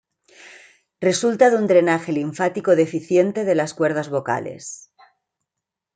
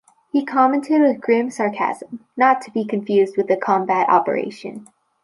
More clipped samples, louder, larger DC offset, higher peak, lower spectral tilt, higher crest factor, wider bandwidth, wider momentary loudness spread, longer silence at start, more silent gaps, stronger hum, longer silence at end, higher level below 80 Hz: neither; about the same, -19 LUFS vs -19 LUFS; neither; about the same, -2 dBFS vs -2 dBFS; second, -5 dB/octave vs -6.5 dB/octave; about the same, 18 dB vs 16 dB; second, 9.4 kHz vs 11.5 kHz; second, 10 LU vs 14 LU; about the same, 0.45 s vs 0.35 s; neither; neither; first, 1.2 s vs 0.4 s; about the same, -70 dBFS vs -74 dBFS